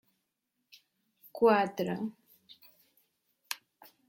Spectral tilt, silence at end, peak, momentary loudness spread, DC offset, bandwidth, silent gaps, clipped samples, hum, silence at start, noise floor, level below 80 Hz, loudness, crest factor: -5.5 dB/octave; 0.55 s; -12 dBFS; 16 LU; under 0.1%; 16.5 kHz; none; under 0.1%; none; 1.35 s; -83 dBFS; -78 dBFS; -31 LUFS; 22 dB